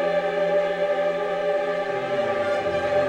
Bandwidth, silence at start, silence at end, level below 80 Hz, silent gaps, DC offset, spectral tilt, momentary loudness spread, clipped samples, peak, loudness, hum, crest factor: 9.2 kHz; 0 s; 0 s; -60 dBFS; none; under 0.1%; -5.5 dB/octave; 3 LU; under 0.1%; -10 dBFS; -24 LUFS; none; 14 dB